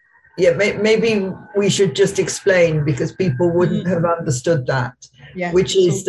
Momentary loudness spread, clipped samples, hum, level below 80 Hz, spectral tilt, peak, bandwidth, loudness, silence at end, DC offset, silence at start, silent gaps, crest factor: 7 LU; under 0.1%; none; -48 dBFS; -5 dB/octave; -2 dBFS; 12.5 kHz; -17 LUFS; 0 s; under 0.1%; 0.35 s; none; 14 dB